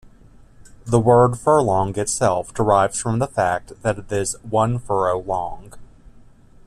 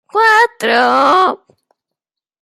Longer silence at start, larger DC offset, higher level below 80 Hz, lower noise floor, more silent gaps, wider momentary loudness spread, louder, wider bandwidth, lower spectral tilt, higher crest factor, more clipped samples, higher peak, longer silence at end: first, 0.65 s vs 0.15 s; neither; first, -44 dBFS vs -68 dBFS; second, -47 dBFS vs -82 dBFS; neither; first, 10 LU vs 6 LU; second, -19 LUFS vs -11 LUFS; second, 14 kHz vs 16 kHz; first, -5.5 dB/octave vs -2.5 dB/octave; about the same, 18 dB vs 14 dB; neither; about the same, -2 dBFS vs 0 dBFS; second, 0.85 s vs 1.05 s